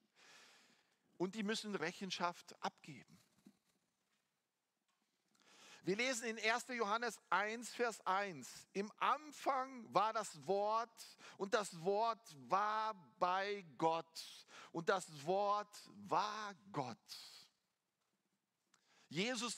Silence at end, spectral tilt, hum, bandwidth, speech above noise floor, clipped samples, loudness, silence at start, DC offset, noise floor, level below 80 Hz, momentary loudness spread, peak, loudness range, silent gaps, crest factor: 0 s; -3.5 dB/octave; none; 16 kHz; 48 dB; under 0.1%; -41 LUFS; 0.3 s; under 0.1%; -90 dBFS; under -90 dBFS; 15 LU; -20 dBFS; 8 LU; none; 24 dB